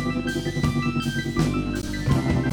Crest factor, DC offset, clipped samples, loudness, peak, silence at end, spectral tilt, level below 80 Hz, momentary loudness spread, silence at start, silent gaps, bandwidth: 14 dB; under 0.1%; under 0.1%; -25 LUFS; -10 dBFS; 0 s; -6 dB/octave; -36 dBFS; 4 LU; 0 s; none; 19.5 kHz